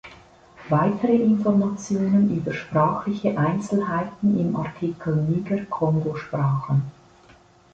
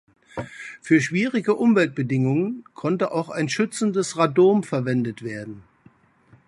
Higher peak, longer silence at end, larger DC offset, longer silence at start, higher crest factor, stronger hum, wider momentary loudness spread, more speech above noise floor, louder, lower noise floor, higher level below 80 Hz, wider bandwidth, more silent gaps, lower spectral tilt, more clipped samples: second, -8 dBFS vs -4 dBFS; about the same, 0.8 s vs 0.85 s; neither; second, 0.05 s vs 0.35 s; about the same, 14 dB vs 18 dB; neither; second, 7 LU vs 17 LU; about the same, 31 dB vs 34 dB; about the same, -23 LUFS vs -22 LUFS; about the same, -53 dBFS vs -56 dBFS; first, -56 dBFS vs -64 dBFS; second, 8 kHz vs 11.5 kHz; neither; first, -8.5 dB/octave vs -6 dB/octave; neither